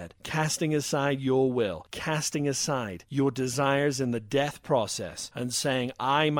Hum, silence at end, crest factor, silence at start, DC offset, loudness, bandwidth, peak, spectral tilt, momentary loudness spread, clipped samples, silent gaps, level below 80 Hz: none; 0 s; 18 dB; 0 s; under 0.1%; -28 LUFS; 17.5 kHz; -10 dBFS; -4.5 dB/octave; 7 LU; under 0.1%; none; -60 dBFS